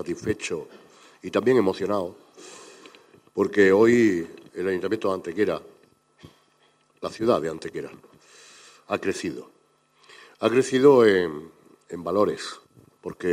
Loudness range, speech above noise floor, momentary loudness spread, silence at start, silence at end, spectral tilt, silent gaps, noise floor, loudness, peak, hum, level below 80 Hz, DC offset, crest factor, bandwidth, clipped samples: 8 LU; 40 dB; 23 LU; 0 s; 0 s; -5.5 dB/octave; none; -63 dBFS; -23 LUFS; -4 dBFS; none; -64 dBFS; under 0.1%; 20 dB; 15 kHz; under 0.1%